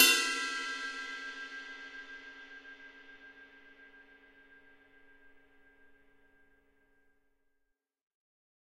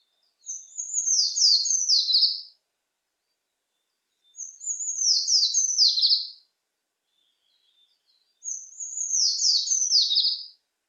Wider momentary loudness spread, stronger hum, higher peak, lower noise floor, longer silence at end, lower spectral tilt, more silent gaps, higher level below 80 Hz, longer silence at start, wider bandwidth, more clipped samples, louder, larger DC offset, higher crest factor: first, 24 LU vs 16 LU; neither; about the same, -8 dBFS vs -8 dBFS; about the same, -81 dBFS vs -81 dBFS; first, 3.25 s vs 0.4 s; first, 2.5 dB/octave vs 9.5 dB/octave; neither; first, -74 dBFS vs under -90 dBFS; second, 0 s vs 0.45 s; first, 16 kHz vs 9.8 kHz; neither; second, -34 LUFS vs -20 LUFS; neither; first, 30 dB vs 18 dB